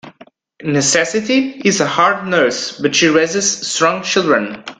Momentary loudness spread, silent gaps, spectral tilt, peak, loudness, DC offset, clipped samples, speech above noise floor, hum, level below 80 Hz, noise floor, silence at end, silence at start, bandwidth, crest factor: 4 LU; none; -3 dB/octave; 0 dBFS; -14 LUFS; under 0.1%; under 0.1%; 30 dB; none; -58 dBFS; -45 dBFS; 0.05 s; 0.05 s; 10.5 kHz; 16 dB